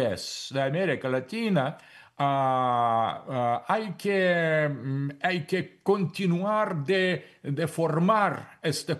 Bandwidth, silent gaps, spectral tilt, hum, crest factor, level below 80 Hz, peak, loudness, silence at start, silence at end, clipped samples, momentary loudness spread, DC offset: 12.5 kHz; none; -6 dB/octave; none; 16 dB; -72 dBFS; -10 dBFS; -27 LUFS; 0 s; 0 s; under 0.1%; 7 LU; under 0.1%